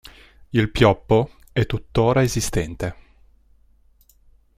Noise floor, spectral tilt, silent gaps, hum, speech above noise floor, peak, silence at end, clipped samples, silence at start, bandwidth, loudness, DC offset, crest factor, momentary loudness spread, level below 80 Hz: -56 dBFS; -5.5 dB/octave; none; none; 36 dB; -2 dBFS; 1.65 s; under 0.1%; 0.5 s; 15.5 kHz; -21 LUFS; under 0.1%; 20 dB; 10 LU; -38 dBFS